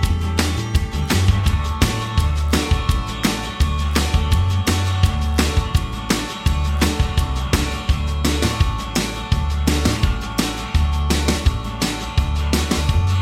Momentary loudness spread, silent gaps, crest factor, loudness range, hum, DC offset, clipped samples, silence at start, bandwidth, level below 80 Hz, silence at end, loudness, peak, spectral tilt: 4 LU; none; 16 dB; 1 LU; none; under 0.1%; under 0.1%; 0 s; 16 kHz; -22 dBFS; 0 s; -20 LUFS; -2 dBFS; -5 dB/octave